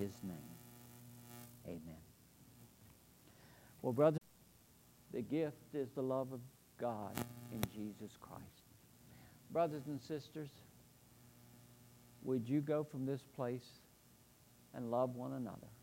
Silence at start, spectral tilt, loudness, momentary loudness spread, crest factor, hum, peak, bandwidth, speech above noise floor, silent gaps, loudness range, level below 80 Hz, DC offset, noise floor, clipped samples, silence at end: 0 s; -7 dB/octave; -42 LUFS; 25 LU; 24 dB; none; -20 dBFS; 16 kHz; 26 dB; none; 7 LU; -74 dBFS; under 0.1%; -67 dBFS; under 0.1%; 0 s